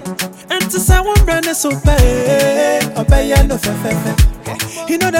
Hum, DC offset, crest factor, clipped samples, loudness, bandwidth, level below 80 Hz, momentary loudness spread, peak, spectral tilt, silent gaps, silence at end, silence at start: none; under 0.1%; 12 dB; under 0.1%; -14 LUFS; 17.5 kHz; -16 dBFS; 8 LU; 0 dBFS; -4.5 dB/octave; none; 0 s; 0 s